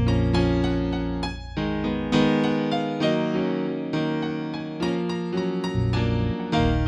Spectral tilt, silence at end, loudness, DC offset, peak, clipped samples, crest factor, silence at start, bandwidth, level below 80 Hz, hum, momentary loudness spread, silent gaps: -7 dB/octave; 0 s; -25 LUFS; under 0.1%; -6 dBFS; under 0.1%; 16 dB; 0 s; 9.8 kHz; -36 dBFS; none; 7 LU; none